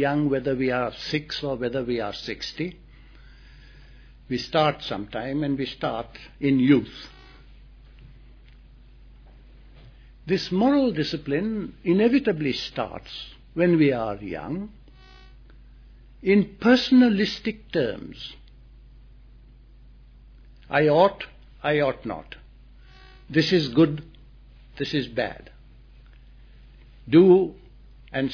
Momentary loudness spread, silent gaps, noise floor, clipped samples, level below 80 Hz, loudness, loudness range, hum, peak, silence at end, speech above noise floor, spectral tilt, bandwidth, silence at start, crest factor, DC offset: 18 LU; none; -49 dBFS; under 0.1%; -50 dBFS; -23 LUFS; 8 LU; none; -6 dBFS; 0 s; 26 dB; -7 dB/octave; 5.4 kHz; 0 s; 20 dB; under 0.1%